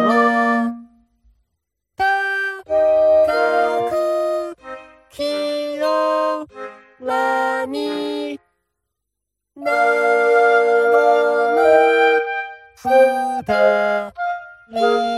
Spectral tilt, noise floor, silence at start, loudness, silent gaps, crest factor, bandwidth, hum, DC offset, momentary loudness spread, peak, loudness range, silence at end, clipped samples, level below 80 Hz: -4 dB/octave; -80 dBFS; 0 s; -17 LUFS; none; 16 dB; 14 kHz; none; under 0.1%; 15 LU; -2 dBFS; 7 LU; 0 s; under 0.1%; -58 dBFS